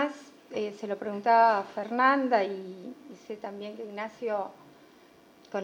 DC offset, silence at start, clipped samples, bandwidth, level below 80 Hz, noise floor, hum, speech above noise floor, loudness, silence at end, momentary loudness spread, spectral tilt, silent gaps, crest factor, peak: under 0.1%; 0 s; under 0.1%; 9.4 kHz; -82 dBFS; -57 dBFS; none; 29 dB; -28 LUFS; 0 s; 20 LU; -5.5 dB/octave; none; 20 dB; -10 dBFS